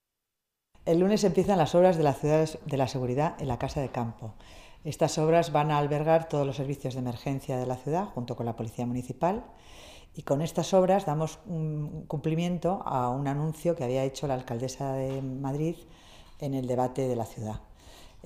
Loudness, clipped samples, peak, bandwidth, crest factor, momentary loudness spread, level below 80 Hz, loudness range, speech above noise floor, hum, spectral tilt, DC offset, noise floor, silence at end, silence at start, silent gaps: -29 LUFS; under 0.1%; -10 dBFS; 15.5 kHz; 18 dB; 12 LU; -52 dBFS; 6 LU; 57 dB; none; -6.5 dB/octave; under 0.1%; -85 dBFS; 0.2 s; 0.85 s; none